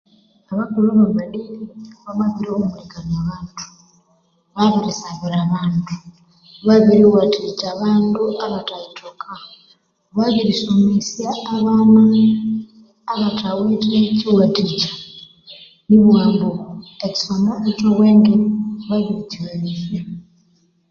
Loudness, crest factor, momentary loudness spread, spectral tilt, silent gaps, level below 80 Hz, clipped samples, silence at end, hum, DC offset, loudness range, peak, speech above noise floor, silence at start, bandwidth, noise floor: -17 LUFS; 16 dB; 21 LU; -7 dB/octave; none; -52 dBFS; under 0.1%; 0.7 s; none; under 0.1%; 7 LU; -2 dBFS; 44 dB; 0.5 s; 7 kHz; -60 dBFS